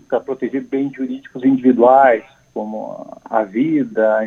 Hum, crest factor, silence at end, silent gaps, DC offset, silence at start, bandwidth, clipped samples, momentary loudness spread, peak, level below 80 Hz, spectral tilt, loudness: none; 16 dB; 0 s; none; under 0.1%; 0.1 s; 6.6 kHz; under 0.1%; 17 LU; 0 dBFS; -66 dBFS; -8.5 dB/octave; -16 LUFS